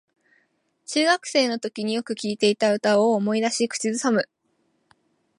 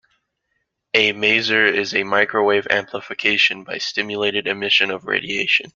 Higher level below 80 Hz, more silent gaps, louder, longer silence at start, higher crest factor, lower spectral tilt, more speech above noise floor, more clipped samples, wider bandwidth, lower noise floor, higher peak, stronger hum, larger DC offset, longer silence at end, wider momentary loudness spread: second, -76 dBFS vs -62 dBFS; neither; second, -22 LUFS vs -18 LUFS; about the same, 0.9 s vs 0.95 s; about the same, 18 dB vs 18 dB; about the same, -3.5 dB/octave vs -3 dB/octave; second, 47 dB vs 53 dB; neither; first, 11.5 kHz vs 7.4 kHz; second, -69 dBFS vs -73 dBFS; second, -6 dBFS vs -2 dBFS; neither; neither; first, 1.15 s vs 0.05 s; about the same, 8 LU vs 7 LU